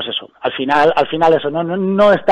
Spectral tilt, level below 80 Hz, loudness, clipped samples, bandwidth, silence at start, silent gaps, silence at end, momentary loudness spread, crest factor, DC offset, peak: -6.5 dB/octave; -52 dBFS; -15 LUFS; under 0.1%; 9.2 kHz; 0 s; none; 0 s; 9 LU; 12 dB; under 0.1%; -2 dBFS